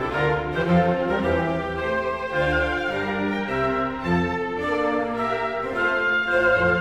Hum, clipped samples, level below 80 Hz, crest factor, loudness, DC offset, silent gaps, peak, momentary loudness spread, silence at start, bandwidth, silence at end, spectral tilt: none; under 0.1%; -42 dBFS; 14 dB; -23 LUFS; 0.2%; none; -8 dBFS; 6 LU; 0 s; 10.5 kHz; 0 s; -7 dB/octave